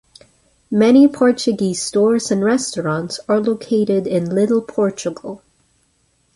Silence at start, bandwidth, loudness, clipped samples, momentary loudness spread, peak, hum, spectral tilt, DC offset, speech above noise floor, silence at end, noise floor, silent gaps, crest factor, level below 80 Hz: 0.7 s; 11.5 kHz; -17 LUFS; under 0.1%; 12 LU; -2 dBFS; none; -5.5 dB/octave; under 0.1%; 46 dB; 1 s; -62 dBFS; none; 16 dB; -58 dBFS